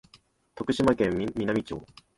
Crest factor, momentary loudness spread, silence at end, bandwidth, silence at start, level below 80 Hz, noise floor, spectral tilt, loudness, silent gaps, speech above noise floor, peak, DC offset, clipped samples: 18 dB; 14 LU; 0.3 s; 11.5 kHz; 0.55 s; -52 dBFS; -61 dBFS; -6.5 dB/octave; -27 LUFS; none; 34 dB; -10 dBFS; under 0.1%; under 0.1%